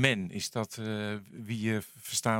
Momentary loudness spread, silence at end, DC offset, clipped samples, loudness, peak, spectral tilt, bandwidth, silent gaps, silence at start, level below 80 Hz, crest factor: 7 LU; 0 s; under 0.1%; under 0.1%; -34 LUFS; -6 dBFS; -4 dB/octave; 17 kHz; none; 0 s; -70 dBFS; 28 dB